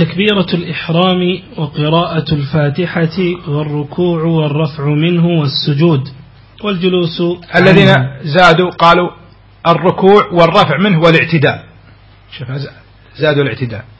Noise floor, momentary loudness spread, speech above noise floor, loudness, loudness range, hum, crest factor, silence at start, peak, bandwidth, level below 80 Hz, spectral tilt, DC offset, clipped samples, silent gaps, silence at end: -41 dBFS; 11 LU; 30 dB; -12 LUFS; 5 LU; none; 12 dB; 0 s; 0 dBFS; 8 kHz; -42 dBFS; -7.5 dB/octave; under 0.1%; 0.5%; none; 0.15 s